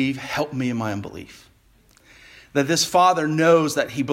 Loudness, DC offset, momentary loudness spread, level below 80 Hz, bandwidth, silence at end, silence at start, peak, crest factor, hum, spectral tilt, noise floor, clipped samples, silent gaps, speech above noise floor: -20 LUFS; under 0.1%; 13 LU; -58 dBFS; 16.5 kHz; 0 s; 0 s; -4 dBFS; 18 dB; none; -4.5 dB/octave; -56 dBFS; under 0.1%; none; 36 dB